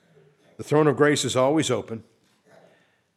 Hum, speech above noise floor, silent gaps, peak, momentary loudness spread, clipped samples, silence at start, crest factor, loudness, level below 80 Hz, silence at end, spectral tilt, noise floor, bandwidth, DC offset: none; 40 dB; none; -6 dBFS; 19 LU; under 0.1%; 0.6 s; 20 dB; -22 LUFS; -72 dBFS; 1.15 s; -5 dB/octave; -62 dBFS; 14 kHz; under 0.1%